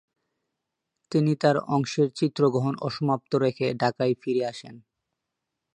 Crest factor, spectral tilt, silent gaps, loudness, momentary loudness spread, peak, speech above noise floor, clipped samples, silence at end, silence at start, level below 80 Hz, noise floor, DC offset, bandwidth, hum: 20 dB; -7 dB/octave; none; -25 LUFS; 6 LU; -6 dBFS; 59 dB; under 0.1%; 0.95 s; 1.1 s; -70 dBFS; -84 dBFS; under 0.1%; 10 kHz; none